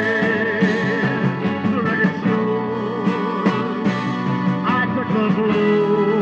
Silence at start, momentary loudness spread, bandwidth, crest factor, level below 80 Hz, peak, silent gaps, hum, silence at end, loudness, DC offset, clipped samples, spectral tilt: 0 s; 4 LU; 7.4 kHz; 14 dB; -58 dBFS; -4 dBFS; none; none; 0 s; -19 LUFS; under 0.1%; under 0.1%; -7.5 dB/octave